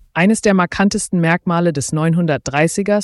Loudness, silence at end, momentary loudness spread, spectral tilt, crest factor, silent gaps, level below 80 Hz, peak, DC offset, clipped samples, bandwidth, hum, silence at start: -16 LUFS; 0 s; 3 LU; -5.5 dB/octave; 12 dB; none; -46 dBFS; -4 dBFS; under 0.1%; under 0.1%; 12 kHz; none; 0.15 s